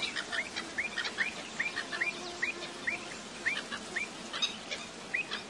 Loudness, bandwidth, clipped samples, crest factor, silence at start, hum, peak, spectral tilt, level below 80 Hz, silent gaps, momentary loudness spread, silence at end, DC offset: -35 LUFS; 11.5 kHz; under 0.1%; 20 dB; 0 s; none; -18 dBFS; -1 dB/octave; -70 dBFS; none; 4 LU; 0 s; under 0.1%